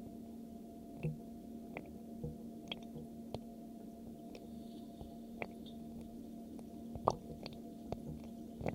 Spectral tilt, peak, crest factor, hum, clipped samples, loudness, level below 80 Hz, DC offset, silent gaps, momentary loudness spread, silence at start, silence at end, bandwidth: -6.5 dB/octave; -10 dBFS; 36 dB; none; under 0.1%; -47 LUFS; -62 dBFS; under 0.1%; none; 7 LU; 0 s; 0 s; 16 kHz